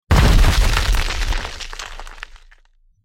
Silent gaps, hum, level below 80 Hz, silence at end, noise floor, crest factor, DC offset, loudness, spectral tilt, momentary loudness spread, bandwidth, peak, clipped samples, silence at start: none; none; -18 dBFS; 0.7 s; -54 dBFS; 16 dB; under 0.1%; -19 LUFS; -4.5 dB/octave; 21 LU; 16.5 kHz; -2 dBFS; under 0.1%; 0.1 s